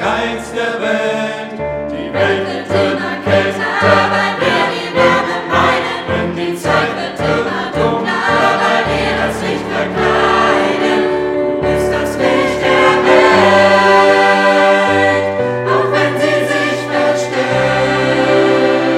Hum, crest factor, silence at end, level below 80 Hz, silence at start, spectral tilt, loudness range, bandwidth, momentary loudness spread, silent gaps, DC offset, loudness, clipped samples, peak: none; 12 dB; 0 s; -40 dBFS; 0 s; -5 dB/octave; 5 LU; 15 kHz; 9 LU; none; under 0.1%; -13 LUFS; under 0.1%; 0 dBFS